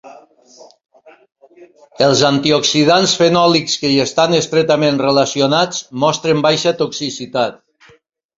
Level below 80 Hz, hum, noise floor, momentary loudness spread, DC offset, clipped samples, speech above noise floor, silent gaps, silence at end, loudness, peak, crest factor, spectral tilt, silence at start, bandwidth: -56 dBFS; none; -52 dBFS; 8 LU; under 0.1%; under 0.1%; 38 dB; none; 0.85 s; -14 LUFS; 0 dBFS; 16 dB; -4 dB/octave; 0.05 s; 7.8 kHz